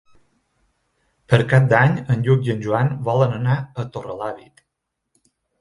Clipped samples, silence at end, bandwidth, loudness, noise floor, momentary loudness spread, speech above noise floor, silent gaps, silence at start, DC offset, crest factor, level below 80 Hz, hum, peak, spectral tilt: under 0.1%; 1.2 s; 10.5 kHz; -19 LUFS; -78 dBFS; 14 LU; 60 dB; none; 1.3 s; under 0.1%; 20 dB; -52 dBFS; none; 0 dBFS; -8 dB/octave